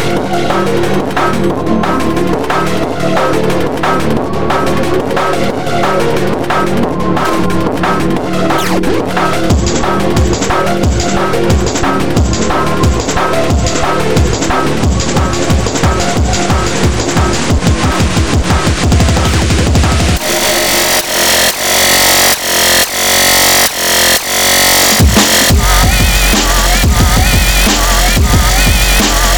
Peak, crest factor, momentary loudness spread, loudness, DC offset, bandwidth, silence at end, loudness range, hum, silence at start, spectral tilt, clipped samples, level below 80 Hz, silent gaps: 0 dBFS; 10 dB; 7 LU; -10 LUFS; 9%; over 20 kHz; 0 s; 6 LU; none; 0 s; -3.5 dB/octave; under 0.1%; -18 dBFS; none